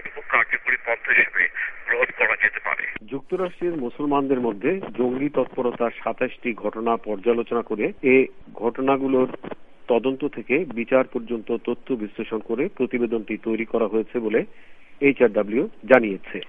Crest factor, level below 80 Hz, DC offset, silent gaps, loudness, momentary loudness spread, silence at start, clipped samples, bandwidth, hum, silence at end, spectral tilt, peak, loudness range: 22 dB; -56 dBFS; under 0.1%; none; -23 LUFS; 10 LU; 0 s; under 0.1%; 3.9 kHz; none; 0 s; -8.5 dB/octave; 0 dBFS; 4 LU